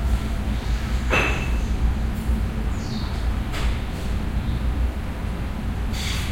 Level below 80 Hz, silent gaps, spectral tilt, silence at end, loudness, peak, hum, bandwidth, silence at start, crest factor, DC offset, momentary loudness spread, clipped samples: -24 dBFS; none; -5.5 dB/octave; 0 s; -26 LUFS; -6 dBFS; none; 16 kHz; 0 s; 16 dB; under 0.1%; 7 LU; under 0.1%